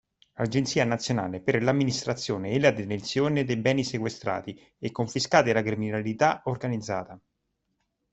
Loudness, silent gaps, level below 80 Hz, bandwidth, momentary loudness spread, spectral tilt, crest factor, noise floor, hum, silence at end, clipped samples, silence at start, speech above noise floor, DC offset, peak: -27 LUFS; none; -60 dBFS; 8.4 kHz; 10 LU; -5.5 dB/octave; 24 dB; -78 dBFS; none; 0.95 s; under 0.1%; 0.4 s; 52 dB; under 0.1%; -4 dBFS